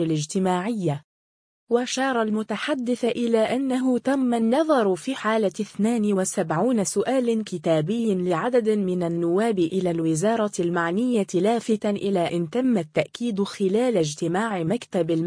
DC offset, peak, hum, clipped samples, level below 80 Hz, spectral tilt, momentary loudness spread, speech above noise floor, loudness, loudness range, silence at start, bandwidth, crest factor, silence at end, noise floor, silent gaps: under 0.1%; -6 dBFS; none; under 0.1%; -66 dBFS; -5.5 dB/octave; 4 LU; over 67 dB; -23 LUFS; 2 LU; 0 s; 10.5 kHz; 16 dB; 0 s; under -90 dBFS; 1.04-1.67 s